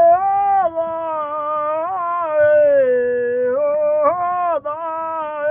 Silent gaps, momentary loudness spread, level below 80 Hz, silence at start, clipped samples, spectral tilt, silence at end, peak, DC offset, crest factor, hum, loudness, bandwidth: none; 9 LU; -60 dBFS; 0 s; under 0.1%; -4 dB/octave; 0 s; -4 dBFS; under 0.1%; 14 dB; none; -18 LUFS; 3.5 kHz